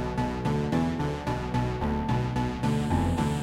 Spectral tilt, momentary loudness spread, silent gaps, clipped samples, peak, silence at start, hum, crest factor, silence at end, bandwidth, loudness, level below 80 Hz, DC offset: -7 dB/octave; 3 LU; none; under 0.1%; -12 dBFS; 0 s; none; 14 dB; 0 s; 14 kHz; -28 LUFS; -38 dBFS; under 0.1%